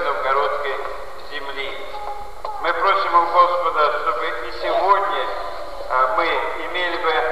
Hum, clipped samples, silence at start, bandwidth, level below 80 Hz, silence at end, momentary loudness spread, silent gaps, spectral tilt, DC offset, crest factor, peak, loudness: none; under 0.1%; 0 s; 15 kHz; -48 dBFS; 0 s; 15 LU; none; -3.5 dB/octave; 3%; 18 dB; -2 dBFS; -20 LUFS